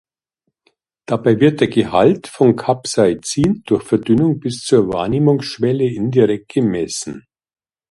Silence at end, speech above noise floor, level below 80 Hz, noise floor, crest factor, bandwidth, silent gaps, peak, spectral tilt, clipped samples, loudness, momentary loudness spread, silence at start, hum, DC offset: 0.7 s; 58 dB; -48 dBFS; -74 dBFS; 16 dB; 11.5 kHz; none; 0 dBFS; -6 dB/octave; under 0.1%; -16 LUFS; 7 LU; 1.1 s; none; under 0.1%